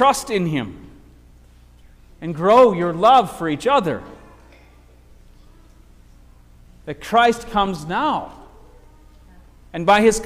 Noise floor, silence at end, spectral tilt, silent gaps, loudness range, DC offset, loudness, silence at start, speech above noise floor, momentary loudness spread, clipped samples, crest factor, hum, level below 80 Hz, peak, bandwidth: -48 dBFS; 0 s; -4.5 dB/octave; none; 8 LU; under 0.1%; -18 LUFS; 0 s; 31 dB; 20 LU; under 0.1%; 18 dB; 60 Hz at -50 dBFS; -46 dBFS; -4 dBFS; 16 kHz